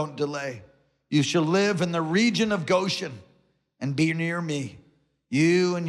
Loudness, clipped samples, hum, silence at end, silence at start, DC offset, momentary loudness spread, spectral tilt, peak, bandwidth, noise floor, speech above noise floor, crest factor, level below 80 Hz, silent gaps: -25 LUFS; under 0.1%; none; 0 s; 0 s; under 0.1%; 12 LU; -5.5 dB/octave; -10 dBFS; 12.5 kHz; -65 dBFS; 41 dB; 14 dB; -68 dBFS; none